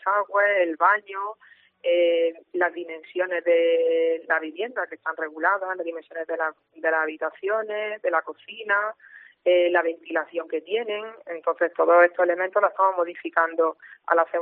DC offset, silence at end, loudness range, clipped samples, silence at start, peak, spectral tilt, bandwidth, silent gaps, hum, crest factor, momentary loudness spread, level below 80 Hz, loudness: under 0.1%; 0 s; 4 LU; under 0.1%; 0 s; -4 dBFS; 1 dB/octave; 3.8 kHz; none; none; 20 dB; 11 LU; -88 dBFS; -24 LUFS